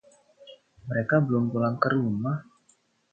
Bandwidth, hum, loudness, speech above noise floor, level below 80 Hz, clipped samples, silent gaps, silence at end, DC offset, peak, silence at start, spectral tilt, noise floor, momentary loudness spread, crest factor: 8.4 kHz; none; -26 LUFS; 41 dB; -64 dBFS; under 0.1%; none; 0.7 s; under 0.1%; -6 dBFS; 0.45 s; -9 dB/octave; -66 dBFS; 9 LU; 22 dB